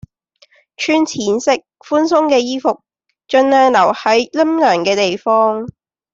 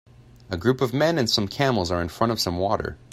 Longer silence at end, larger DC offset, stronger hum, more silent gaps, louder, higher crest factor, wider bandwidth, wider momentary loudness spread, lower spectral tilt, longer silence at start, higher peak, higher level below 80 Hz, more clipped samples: first, 0.45 s vs 0.15 s; neither; neither; neither; first, -14 LUFS vs -23 LUFS; about the same, 14 dB vs 18 dB; second, 7.8 kHz vs 16 kHz; first, 9 LU vs 5 LU; about the same, -4 dB/octave vs -5 dB/octave; first, 0.8 s vs 0.5 s; first, -2 dBFS vs -6 dBFS; second, -58 dBFS vs -50 dBFS; neither